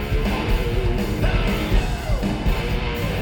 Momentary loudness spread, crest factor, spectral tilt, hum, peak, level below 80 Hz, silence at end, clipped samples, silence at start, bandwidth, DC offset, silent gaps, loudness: 3 LU; 14 dB; -6 dB/octave; none; -8 dBFS; -24 dBFS; 0 s; under 0.1%; 0 s; 18.5 kHz; under 0.1%; none; -23 LUFS